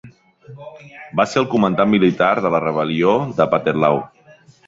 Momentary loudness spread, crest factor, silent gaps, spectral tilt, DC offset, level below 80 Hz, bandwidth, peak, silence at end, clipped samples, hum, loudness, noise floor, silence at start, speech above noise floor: 22 LU; 16 dB; none; -6.5 dB/octave; under 0.1%; -56 dBFS; 7.8 kHz; -2 dBFS; 0.6 s; under 0.1%; none; -17 LUFS; -48 dBFS; 0.05 s; 31 dB